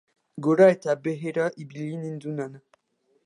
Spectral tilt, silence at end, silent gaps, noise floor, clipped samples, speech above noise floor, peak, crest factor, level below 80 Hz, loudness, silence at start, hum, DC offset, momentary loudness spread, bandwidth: -7.5 dB/octave; 0.65 s; none; -70 dBFS; under 0.1%; 46 dB; -6 dBFS; 20 dB; -76 dBFS; -25 LUFS; 0.35 s; none; under 0.1%; 17 LU; 10.5 kHz